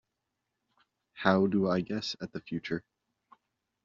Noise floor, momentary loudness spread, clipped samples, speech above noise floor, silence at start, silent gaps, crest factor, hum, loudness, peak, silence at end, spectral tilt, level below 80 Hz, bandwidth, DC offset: -85 dBFS; 12 LU; under 0.1%; 55 dB; 1.15 s; none; 26 dB; none; -31 LUFS; -8 dBFS; 1.05 s; -5 dB/octave; -68 dBFS; 7.4 kHz; under 0.1%